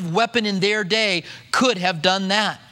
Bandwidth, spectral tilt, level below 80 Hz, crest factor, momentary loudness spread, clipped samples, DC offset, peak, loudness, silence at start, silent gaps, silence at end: 16 kHz; -3.5 dB/octave; -66 dBFS; 20 dB; 3 LU; under 0.1%; under 0.1%; 0 dBFS; -19 LUFS; 0 s; none; 0.15 s